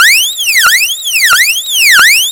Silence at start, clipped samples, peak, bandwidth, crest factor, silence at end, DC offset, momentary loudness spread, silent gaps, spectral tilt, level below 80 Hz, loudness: 0 s; 2%; 0 dBFS; over 20 kHz; 8 dB; 0 s; under 0.1%; 5 LU; none; 4 dB/octave; -48 dBFS; -5 LUFS